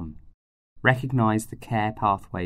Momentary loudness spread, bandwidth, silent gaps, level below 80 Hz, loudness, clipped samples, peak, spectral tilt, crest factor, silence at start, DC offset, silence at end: 6 LU; 15 kHz; 0.34-0.76 s; -50 dBFS; -24 LUFS; under 0.1%; -4 dBFS; -6.5 dB/octave; 22 dB; 0 s; under 0.1%; 0 s